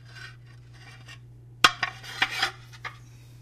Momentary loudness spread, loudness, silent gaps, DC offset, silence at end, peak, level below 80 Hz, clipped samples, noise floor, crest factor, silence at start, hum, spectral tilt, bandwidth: 26 LU; -25 LUFS; none; under 0.1%; 0 s; 0 dBFS; -58 dBFS; under 0.1%; -48 dBFS; 30 dB; 0.05 s; none; -1.5 dB/octave; 15.5 kHz